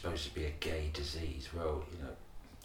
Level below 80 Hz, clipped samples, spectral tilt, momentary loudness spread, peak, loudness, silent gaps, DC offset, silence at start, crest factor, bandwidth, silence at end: -46 dBFS; under 0.1%; -5 dB/octave; 10 LU; -18 dBFS; -40 LUFS; none; under 0.1%; 0 s; 22 dB; 16.5 kHz; 0 s